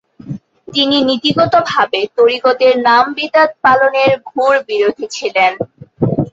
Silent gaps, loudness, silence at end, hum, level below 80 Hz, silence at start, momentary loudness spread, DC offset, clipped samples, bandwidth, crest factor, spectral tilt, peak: none; -13 LUFS; 0.05 s; none; -50 dBFS; 0.25 s; 11 LU; under 0.1%; under 0.1%; 7.8 kHz; 12 dB; -5 dB/octave; 0 dBFS